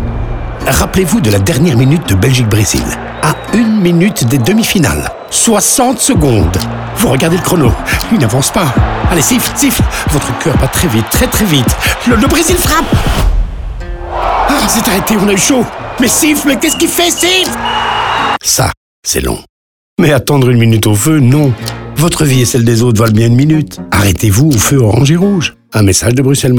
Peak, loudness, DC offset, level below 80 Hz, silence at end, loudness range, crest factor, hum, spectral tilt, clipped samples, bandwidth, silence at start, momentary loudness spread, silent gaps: 0 dBFS; -10 LUFS; under 0.1%; -22 dBFS; 0 s; 2 LU; 10 dB; none; -4.5 dB/octave; under 0.1%; over 20 kHz; 0 s; 6 LU; 18.77-19.03 s, 19.49-19.97 s